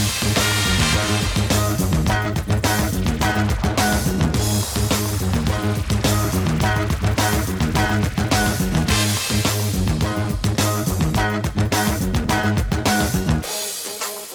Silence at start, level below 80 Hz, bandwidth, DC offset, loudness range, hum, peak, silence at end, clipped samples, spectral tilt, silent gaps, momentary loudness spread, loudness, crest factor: 0 s; -28 dBFS; 18 kHz; under 0.1%; 1 LU; none; -6 dBFS; 0 s; under 0.1%; -4.5 dB/octave; none; 4 LU; -20 LUFS; 14 dB